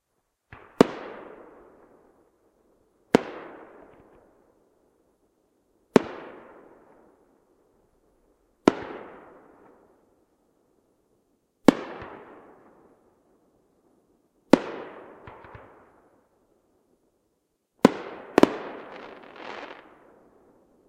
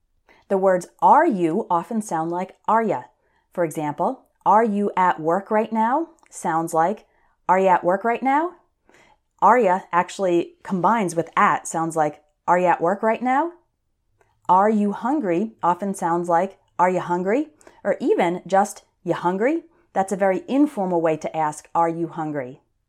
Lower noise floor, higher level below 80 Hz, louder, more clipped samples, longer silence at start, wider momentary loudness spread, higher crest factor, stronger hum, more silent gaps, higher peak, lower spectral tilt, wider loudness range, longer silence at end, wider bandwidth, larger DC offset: first, -76 dBFS vs -70 dBFS; first, -62 dBFS vs -68 dBFS; second, -25 LUFS vs -21 LUFS; neither; first, 0.8 s vs 0.5 s; first, 26 LU vs 10 LU; first, 30 dB vs 18 dB; neither; neither; about the same, 0 dBFS vs -2 dBFS; about the same, -6 dB/octave vs -6 dB/octave; first, 6 LU vs 2 LU; first, 1.15 s vs 0.35 s; first, 15.5 kHz vs 14 kHz; neither